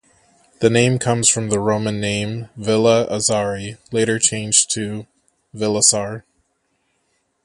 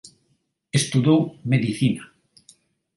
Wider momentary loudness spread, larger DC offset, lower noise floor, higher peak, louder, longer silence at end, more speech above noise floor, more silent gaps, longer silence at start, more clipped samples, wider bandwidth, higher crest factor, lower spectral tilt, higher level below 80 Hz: first, 12 LU vs 6 LU; neither; about the same, -68 dBFS vs -69 dBFS; first, 0 dBFS vs -6 dBFS; first, -17 LUFS vs -22 LUFS; first, 1.25 s vs 0.9 s; about the same, 50 dB vs 49 dB; neither; second, 0.6 s vs 0.75 s; neither; about the same, 12 kHz vs 11.5 kHz; about the same, 20 dB vs 18 dB; second, -3.5 dB/octave vs -5.5 dB/octave; first, -52 dBFS vs -60 dBFS